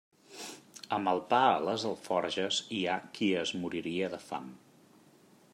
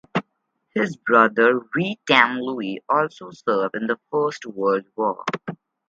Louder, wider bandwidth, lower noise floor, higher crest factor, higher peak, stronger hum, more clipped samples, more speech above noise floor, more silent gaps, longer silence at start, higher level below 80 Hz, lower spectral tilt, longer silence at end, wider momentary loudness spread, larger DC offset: second, -32 LUFS vs -21 LUFS; first, 16 kHz vs 7.6 kHz; second, -61 dBFS vs -73 dBFS; about the same, 20 dB vs 22 dB; second, -12 dBFS vs 0 dBFS; neither; neither; second, 29 dB vs 52 dB; neither; first, 0.3 s vs 0.15 s; second, -78 dBFS vs -70 dBFS; second, -4 dB/octave vs -5.5 dB/octave; first, 1 s vs 0.35 s; first, 18 LU vs 13 LU; neither